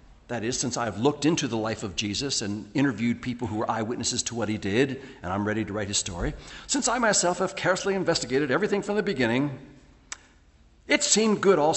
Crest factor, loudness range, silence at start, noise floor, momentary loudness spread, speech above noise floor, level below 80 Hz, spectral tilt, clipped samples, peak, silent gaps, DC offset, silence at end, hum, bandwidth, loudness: 20 dB; 3 LU; 0.1 s; -57 dBFS; 11 LU; 31 dB; -50 dBFS; -3.5 dB/octave; under 0.1%; -6 dBFS; none; under 0.1%; 0 s; none; 8.6 kHz; -26 LUFS